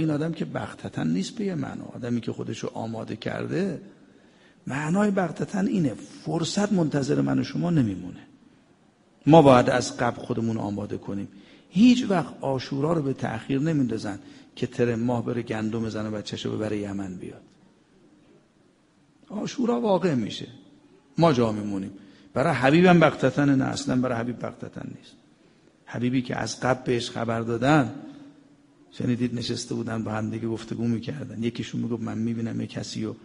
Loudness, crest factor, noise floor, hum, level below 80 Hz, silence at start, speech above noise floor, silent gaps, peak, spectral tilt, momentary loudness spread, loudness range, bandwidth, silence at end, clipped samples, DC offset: -25 LUFS; 24 dB; -61 dBFS; none; -58 dBFS; 0 s; 36 dB; none; -2 dBFS; -6.5 dB/octave; 15 LU; 8 LU; 10.5 kHz; 0.05 s; under 0.1%; under 0.1%